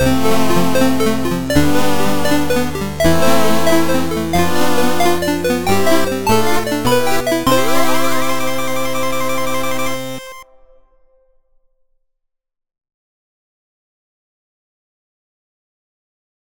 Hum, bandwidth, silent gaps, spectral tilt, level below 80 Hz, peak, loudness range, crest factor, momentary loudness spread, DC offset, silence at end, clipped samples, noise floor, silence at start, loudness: none; 17.5 kHz; none; -4.5 dB/octave; -36 dBFS; -2 dBFS; 9 LU; 16 dB; 5 LU; 10%; 3.55 s; under 0.1%; -71 dBFS; 0 s; -16 LUFS